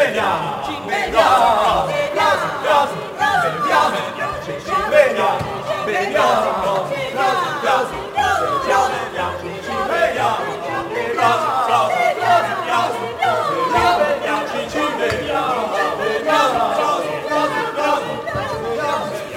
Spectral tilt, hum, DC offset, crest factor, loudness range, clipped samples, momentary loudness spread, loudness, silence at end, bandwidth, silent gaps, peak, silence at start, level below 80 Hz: -4 dB/octave; none; under 0.1%; 16 dB; 2 LU; under 0.1%; 8 LU; -18 LUFS; 0 s; 17 kHz; none; -2 dBFS; 0 s; -48 dBFS